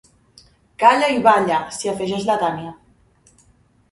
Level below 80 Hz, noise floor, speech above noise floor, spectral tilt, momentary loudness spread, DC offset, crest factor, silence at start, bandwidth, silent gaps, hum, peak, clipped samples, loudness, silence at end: -58 dBFS; -57 dBFS; 39 dB; -4 dB/octave; 11 LU; under 0.1%; 20 dB; 0.8 s; 11.5 kHz; none; none; 0 dBFS; under 0.1%; -18 LUFS; 1.15 s